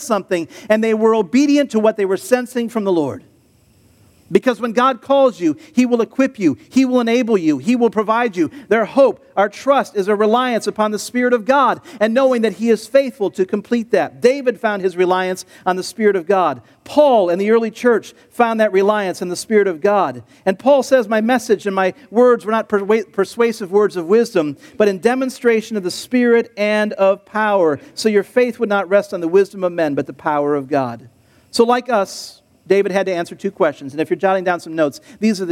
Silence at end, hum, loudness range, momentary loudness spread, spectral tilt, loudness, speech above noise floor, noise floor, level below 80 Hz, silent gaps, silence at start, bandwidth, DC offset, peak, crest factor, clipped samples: 0 s; none; 3 LU; 7 LU; -5 dB/octave; -17 LUFS; 37 dB; -53 dBFS; -66 dBFS; none; 0 s; 15.5 kHz; under 0.1%; 0 dBFS; 16 dB; under 0.1%